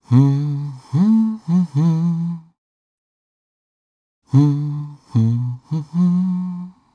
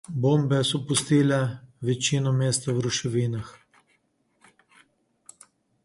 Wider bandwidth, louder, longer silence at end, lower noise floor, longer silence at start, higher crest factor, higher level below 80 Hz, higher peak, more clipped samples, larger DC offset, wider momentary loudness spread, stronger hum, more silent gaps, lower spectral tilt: second, 7 kHz vs 11.5 kHz; first, -19 LUFS vs -24 LUFS; second, 0.25 s vs 2.3 s; first, under -90 dBFS vs -69 dBFS; about the same, 0.1 s vs 0.1 s; about the same, 16 dB vs 18 dB; second, -66 dBFS vs -60 dBFS; first, -2 dBFS vs -10 dBFS; neither; neither; about the same, 11 LU vs 9 LU; neither; first, 2.58-4.22 s vs none; first, -10 dB/octave vs -5 dB/octave